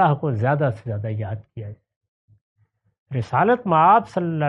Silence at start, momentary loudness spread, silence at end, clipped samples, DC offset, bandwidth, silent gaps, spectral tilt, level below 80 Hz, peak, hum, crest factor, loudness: 0 s; 18 LU; 0 s; under 0.1%; under 0.1%; 7.4 kHz; 1.96-2.01 s, 2.08-2.28 s, 2.41-2.56 s, 2.98-3.06 s; -9 dB/octave; -62 dBFS; -4 dBFS; none; 18 dB; -20 LUFS